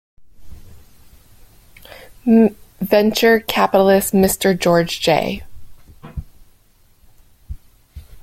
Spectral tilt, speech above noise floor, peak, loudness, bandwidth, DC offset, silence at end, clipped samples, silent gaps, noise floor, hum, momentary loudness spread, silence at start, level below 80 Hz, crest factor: -5 dB/octave; 38 dB; -2 dBFS; -15 LUFS; 16.5 kHz; under 0.1%; 0.05 s; under 0.1%; none; -53 dBFS; none; 22 LU; 0.2 s; -42 dBFS; 18 dB